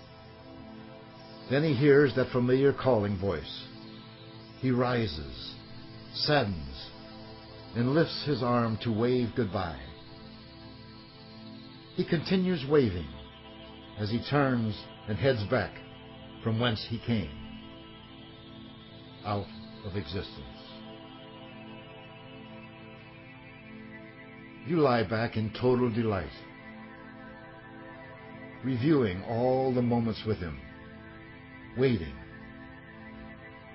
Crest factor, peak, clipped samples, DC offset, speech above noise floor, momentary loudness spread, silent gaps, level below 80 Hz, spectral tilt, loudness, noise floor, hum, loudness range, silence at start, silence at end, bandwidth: 20 dB; -10 dBFS; under 0.1%; under 0.1%; 21 dB; 21 LU; none; -52 dBFS; -10.5 dB/octave; -29 LUFS; -49 dBFS; none; 13 LU; 0 s; 0 s; 5.8 kHz